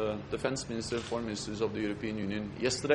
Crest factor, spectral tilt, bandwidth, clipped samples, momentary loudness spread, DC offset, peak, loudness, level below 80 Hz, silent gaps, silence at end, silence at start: 20 dB; -4.5 dB/octave; 11.5 kHz; under 0.1%; 3 LU; under 0.1%; -14 dBFS; -35 LUFS; -56 dBFS; none; 0 s; 0 s